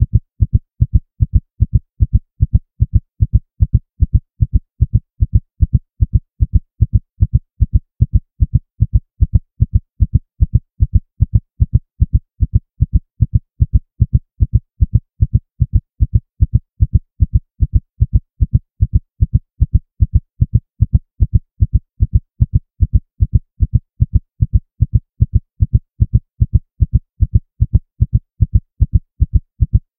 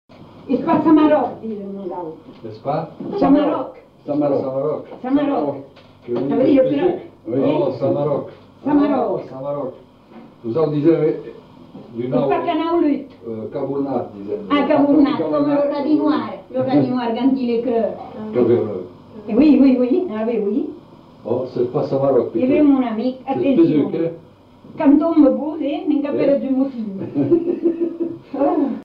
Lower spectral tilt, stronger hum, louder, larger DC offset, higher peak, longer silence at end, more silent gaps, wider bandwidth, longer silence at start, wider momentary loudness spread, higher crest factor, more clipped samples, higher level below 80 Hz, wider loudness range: first, -16 dB/octave vs -9.5 dB/octave; neither; about the same, -18 LUFS vs -18 LUFS; first, 0.6% vs under 0.1%; first, 0 dBFS vs -4 dBFS; first, 0.2 s vs 0 s; neither; second, 0.7 kHz vs 5.2 kHz; second, 0 s vs 0.2 s; second, 1 LU vs 14 LU; about the same, 14 dB vs 14 dB; first, 0.2% vs under 0.1%; first, -18 dBFS vs -54 dBFS; second, 1 LU vs 4 LU